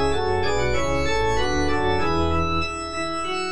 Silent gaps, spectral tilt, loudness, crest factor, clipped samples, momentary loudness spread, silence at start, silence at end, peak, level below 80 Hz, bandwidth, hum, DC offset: none; -5 dB/octave; -23 LUFS; 12 dB; under 0.1%; 4 LU; 0 s; 0 s; -10 dBFS; -34 dBFS; 10.5 kHz; none; 5%